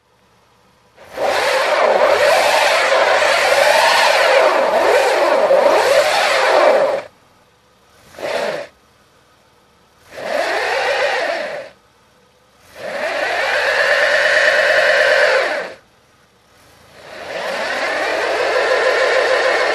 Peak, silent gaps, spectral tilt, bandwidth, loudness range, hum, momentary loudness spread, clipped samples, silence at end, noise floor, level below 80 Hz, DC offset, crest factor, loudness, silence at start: 0 dBFS; none; -1 dB/octave; 14 kHz; 9 LU; none; 12 LU; under 0.1%; 0 s; -54 dBFS; -60 dBFS; under 0.1%; 16 dB; -14 LUFS; 1 s